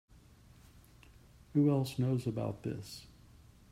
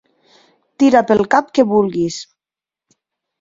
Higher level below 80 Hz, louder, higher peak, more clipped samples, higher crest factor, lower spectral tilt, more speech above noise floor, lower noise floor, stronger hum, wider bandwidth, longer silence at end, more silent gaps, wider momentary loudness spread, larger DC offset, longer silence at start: second, -62 dBFS vs -54 dBFS; second, -34 LUFS vs -15 LUFS; second, -20 dBFS vs 0 dBFS; neither; about the same, 18 dB vs 18 dB; first, -8 dB/octave vs -5.5 dB/octave; second, 27 dB vs 75 dB; second, -60 dBFS vs -89 dBFS; neither; first, 15.5 kHz vs 7.8 kHz; second, 0.65 s vs 1.15 s; neither; first, 16 LU vs 9 LU; neither; first, 1.55 s vs 0.8 s